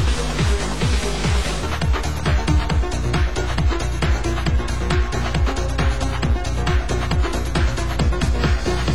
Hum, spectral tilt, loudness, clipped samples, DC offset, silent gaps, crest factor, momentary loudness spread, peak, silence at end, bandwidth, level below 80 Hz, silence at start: none; -5.5 dB/octave; -21 LUFS; under 0.1%; 3%; none; 14 dB; 2 LU; -6 dBFS; 0 s; 12.5 kHz; -22 dBFS; 0 s